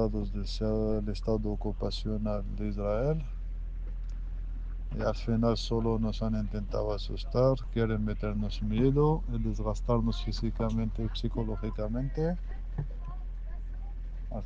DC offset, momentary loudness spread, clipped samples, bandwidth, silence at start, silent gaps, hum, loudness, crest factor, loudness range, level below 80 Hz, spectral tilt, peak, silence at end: under 0.1%; 13 LU; under 0.1%; 7.4 kHz; 0 s; none; none; -33 LUFS; 18 dB; 5 LU; -34 dBFS; -8 dB/octave; -12 dBFS; 0 s